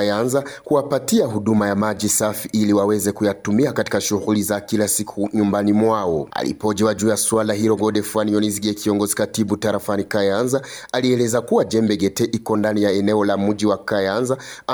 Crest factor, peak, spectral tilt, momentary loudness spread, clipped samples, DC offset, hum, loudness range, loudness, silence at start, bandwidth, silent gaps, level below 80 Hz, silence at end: 14 dB; -4 dBFS; -4.5 dB/octave; 5 LU; under 0.1%; under 0.1%; none; 1 LU; -19 LUFS; 0 s; over 20 kHz; none; -56 dBFS; 0 s